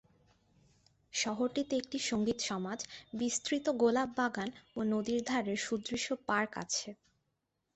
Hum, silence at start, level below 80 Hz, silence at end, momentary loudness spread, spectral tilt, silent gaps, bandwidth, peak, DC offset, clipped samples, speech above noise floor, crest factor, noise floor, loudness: none; 1.15 s; -70 dBFS; 0.8 s; 9 LU; -3 dB/octave; none; 8.4 kHz; -18 dBFS; under 0.1%; under 0.1%; 49 dB; 18 dB; -83 dBFS; -35 LUFS